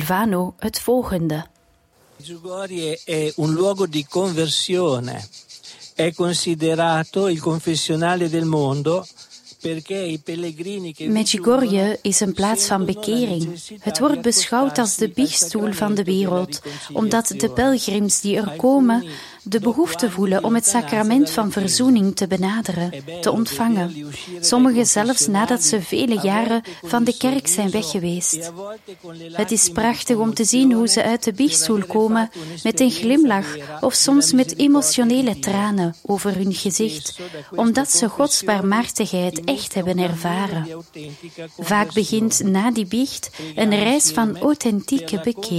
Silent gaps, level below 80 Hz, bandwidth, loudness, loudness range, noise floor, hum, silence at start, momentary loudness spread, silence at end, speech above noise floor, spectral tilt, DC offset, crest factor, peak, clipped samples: none; -54 dBFS; 16 kHz; -19 LUFS; 5 LU; -58 dBFS; none; 0 s; 13 LU; 0 s; 38 dB; -3.5 dB/octave; under 0.1%; 18 dB; -2 dBFS; under 0.1%